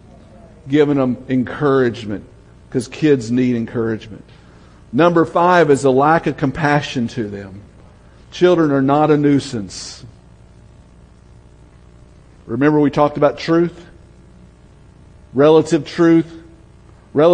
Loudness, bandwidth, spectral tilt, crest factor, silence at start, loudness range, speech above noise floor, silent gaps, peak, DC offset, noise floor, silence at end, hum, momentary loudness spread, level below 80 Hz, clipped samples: -16 LUFS; 10.5 kHz; -6.5 dB/octave; 16 dB; 0.65 s; 5 LU; 29 dB; none; 0 dBFS; under 0.1%; -45 dBFS; 0 s; 60 Hz at -45 dBFS; 15 LU; -48 dBFS; under 0.1%